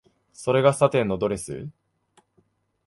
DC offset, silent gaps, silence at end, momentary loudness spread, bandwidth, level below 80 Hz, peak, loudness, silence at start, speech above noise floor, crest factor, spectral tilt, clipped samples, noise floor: under 0.1%; none; 1.15 s; 17 LU; 11.5 kHz; -56 dBFS; -4 dBFS; -23 LUFS; 0.4 s; 44 dB; 22 dB; -5.5 dB/octave; under 0.1%; -67 dBFS